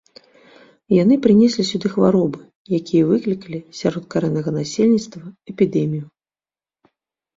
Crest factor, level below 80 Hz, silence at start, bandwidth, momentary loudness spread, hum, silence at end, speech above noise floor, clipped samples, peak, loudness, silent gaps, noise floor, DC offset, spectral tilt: 18 dB; -58 dBFS; 0.9 s; 7.8 kHz; 15 LU; none; 1.35 s; over 72 dB; under 0.1%; -2 dBFS; -18 LUFS; 2.56-2.65 s; under -90 dBFS; under 0.1%; -7 dB/octave